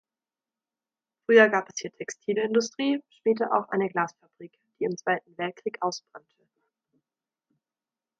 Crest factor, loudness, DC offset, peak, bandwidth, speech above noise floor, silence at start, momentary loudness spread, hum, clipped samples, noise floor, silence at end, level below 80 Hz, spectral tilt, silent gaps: 24 dB; -26 LUFS; under 0.1%; -4 dBFS; 7.8 kHz; over 64 dB; 1.3 s; 16 LU; none; under 0.1%; under -90 dBFS; 2 s; -80 dBFS; -4 dB/octave; none